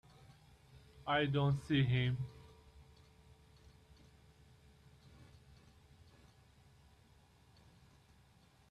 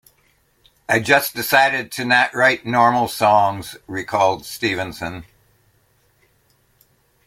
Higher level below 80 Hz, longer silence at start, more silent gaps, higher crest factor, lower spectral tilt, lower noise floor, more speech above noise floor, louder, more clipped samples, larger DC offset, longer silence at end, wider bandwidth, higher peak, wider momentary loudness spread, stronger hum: second, -66 dBFS vs -56 dBFS; second, 0.75 s vs 0.9 s; neither; about the same, 22 dB vs 20 dB; first, -7.5 dB/octave vs -3.5 dB/octave; first, -67 dBFS vs -60 dBFS; second, 33 dB vs 42 dB; second, -36 LUFS vs -17 LUFS; neither; neither; first, 5.9 s vs 2.05 s; second, 10 kHz vs 16.5 kHz; second, -22 dBFS vs 0 dBFS; first, 29 LU vs 14 LU; neither